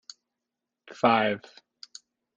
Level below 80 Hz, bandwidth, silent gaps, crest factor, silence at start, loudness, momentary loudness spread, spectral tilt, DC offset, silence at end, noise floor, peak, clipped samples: -72 dBFS; 9.4 kHz; none; 22 dB; 0.9 s; -25 LUFS; 24 LU; -5 dB/octave; under 0.1%; 1 s; -87 dBFS; -8 dBFS; under 0.1%